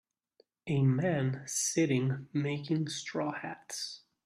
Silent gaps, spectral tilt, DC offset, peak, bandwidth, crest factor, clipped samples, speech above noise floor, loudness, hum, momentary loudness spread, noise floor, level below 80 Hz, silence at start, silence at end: none; -5 dB/octave; under 0.1%; -16 dBFS; 13 kHz; 16 dB; under 0.1%; 38 dB; -32 LUFS; none; 11 LU; -70 dBFS; -72 dBFS; 0.65 s; 0.25 s